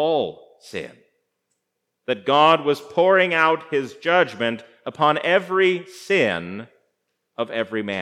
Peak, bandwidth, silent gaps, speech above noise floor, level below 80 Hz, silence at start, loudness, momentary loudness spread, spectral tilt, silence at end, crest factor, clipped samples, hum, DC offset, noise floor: -2 dBFS; 13.5 kHz; none; 57 dB; -74 dBFS; 0 s; -20 LUFS; 18 LU; -5 dB/octave; 0 s; 20 dB; under 0.1%; none; under 0.1%; -78 dBFS